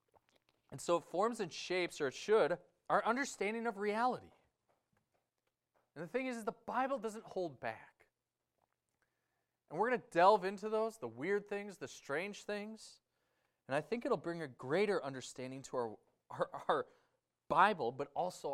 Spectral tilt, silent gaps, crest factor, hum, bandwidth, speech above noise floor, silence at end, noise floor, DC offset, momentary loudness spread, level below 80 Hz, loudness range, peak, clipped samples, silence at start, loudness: -4.5 dB/octave; none; 24 dB; none; 14 kHz; 52 dB; 0 s; -89 dBFS; under 0.1%; 14 LU; -80 dBFS; 7 LU; -16 dBFS; under 0.1%; 0.7 s; -38 LUFS